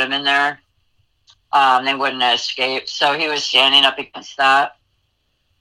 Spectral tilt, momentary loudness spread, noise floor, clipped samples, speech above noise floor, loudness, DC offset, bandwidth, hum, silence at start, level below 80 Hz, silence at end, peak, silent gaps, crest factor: -1 dB/octave; 9 LU; -67 dBFS; under 0.1%; 50 dB; -15 LUFS; under 0.1%; 16.5 kHz; none; 0 s; -68 dBFS; 0.9 s; 0 dBFS; none; 18 dB